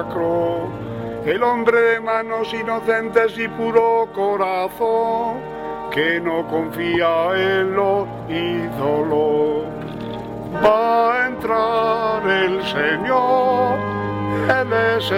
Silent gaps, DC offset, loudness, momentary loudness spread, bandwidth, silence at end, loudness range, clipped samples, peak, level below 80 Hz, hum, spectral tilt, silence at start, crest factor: none; under 0.1%; -19 LUFS; 9 LU; 16 kHz; 0 s; 2 LU; under 0.1%; 0 dBFS; -50 dBFS; none; -6.5 dB/octave; 0 s; 18 dB